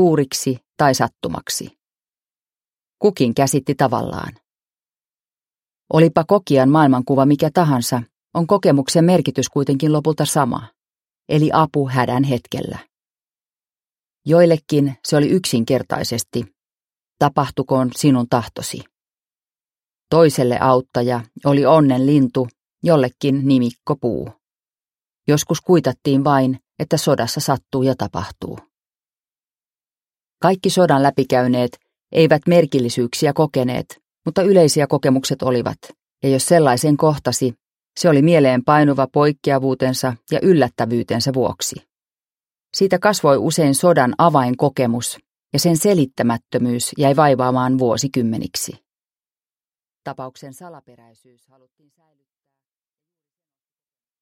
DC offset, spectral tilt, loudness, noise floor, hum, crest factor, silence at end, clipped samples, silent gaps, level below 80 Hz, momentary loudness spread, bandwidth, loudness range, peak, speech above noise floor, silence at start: under 0.1%; -5.5 dB/octave; -17 LUFS; under -90 dBFS; none; 18 dB; 3.45 s; under 0.1%; 8.17-8.21 s; -54 dBFS; 13 LU; 16.5 kHz; 5 LU; 0 dBFS; over 74 dB; 0 s